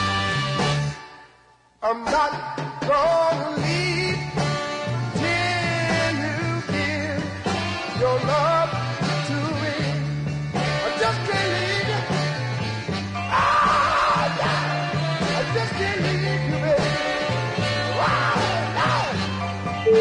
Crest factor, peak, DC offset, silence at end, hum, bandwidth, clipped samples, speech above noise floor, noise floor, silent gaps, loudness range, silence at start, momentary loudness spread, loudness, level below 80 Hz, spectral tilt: 14 dB; -8 dBFS; under 0.1%; 0 s; none; 11 kHz; under 0.1%; 34 dB; -55 dBFS; none; 2 LU; 0 s; 7 LU; -23 LUFS; -48 dBFS; -5 dB/octave